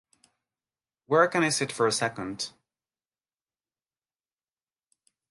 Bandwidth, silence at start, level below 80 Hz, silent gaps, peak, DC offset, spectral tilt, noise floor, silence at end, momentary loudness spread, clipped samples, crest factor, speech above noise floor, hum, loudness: 11.5 kHz; 1.1 s; -72 dBFS; none; -8 dBFS; under 0.1%; -3.5 dB/octave; under -90 dBFS; 2.8 s; 12 LU; under 0.1%; 24 dB; over 64 dB; none; -26 LUFS